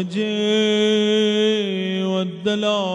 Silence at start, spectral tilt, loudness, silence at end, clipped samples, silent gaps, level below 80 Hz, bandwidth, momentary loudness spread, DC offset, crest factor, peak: 0 s; -5 dB/octave; -19 LUFS; 0 s; under 0.1%; none; -68 dBFS; 10.5 kHz; 6 LU; under 0.1%; 12 dB; -8 dBFS